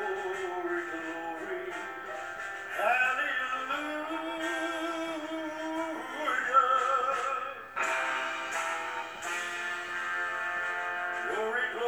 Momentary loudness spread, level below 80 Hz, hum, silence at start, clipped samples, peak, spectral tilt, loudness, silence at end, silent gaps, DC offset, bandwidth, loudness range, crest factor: 10 LU; -74 dBFS; none; 0 s; under 0.1%; -12 dBFS; -2 dB/octave; -31 LUFS; 0 s; none; under 0.1%; over 20 kHz; 3 LU; 20 dB